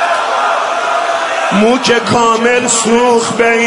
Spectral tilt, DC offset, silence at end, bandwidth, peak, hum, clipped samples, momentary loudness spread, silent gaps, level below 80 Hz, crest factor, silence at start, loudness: -3 dB/octave; under 0.1%; 0 s; 11 kHz; 0 dBFS; none; under 0.1%; 4 LU; none; -50 dBFS; 12 dB; 0 s; -11 LUFS